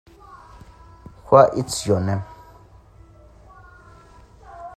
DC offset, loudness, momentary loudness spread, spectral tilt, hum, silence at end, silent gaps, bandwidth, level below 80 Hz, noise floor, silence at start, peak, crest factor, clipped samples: under 0.1%; -18 LUFS; 22 LU; -5.5 dB/octave; none; 0.05 s; none; 14.5 kHz; -50 dBFS; -48 dBFS; 0.35 s; 0 dBFS; 24 dB; under 0.1%